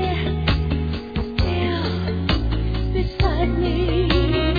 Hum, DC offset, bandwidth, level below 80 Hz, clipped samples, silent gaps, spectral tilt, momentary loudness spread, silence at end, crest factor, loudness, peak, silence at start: none; 0.4%; 5 kHz; -24 dBFS; under 0.1%; none; -8 dB/octave; 5 LU; 0 s; 16 dB; -22 LUFS; -4 dBFS; 0 s